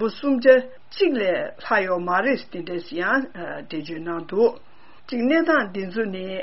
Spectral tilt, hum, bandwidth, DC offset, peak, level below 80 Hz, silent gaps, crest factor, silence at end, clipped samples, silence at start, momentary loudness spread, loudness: -3 dB/octave; none; 6 kHz; 0.9%; -2 dBFS; -64 dBFS; none; 20 dB; 0 s; under 0.1%; 0 s; 13 LU; -22 LUFS